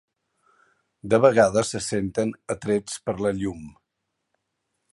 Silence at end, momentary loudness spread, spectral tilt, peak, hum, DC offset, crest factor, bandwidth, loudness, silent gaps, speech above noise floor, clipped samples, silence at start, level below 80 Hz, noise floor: 1.25 s; 14 LU; -5 dB/octave; -2 dBFS; none; under 0.1%; 22 dB; 11.5 kHz; -23 LUFS; none; 57 dB; under 0.1%; 1.05 s; -54 dBFS; -79 dBFS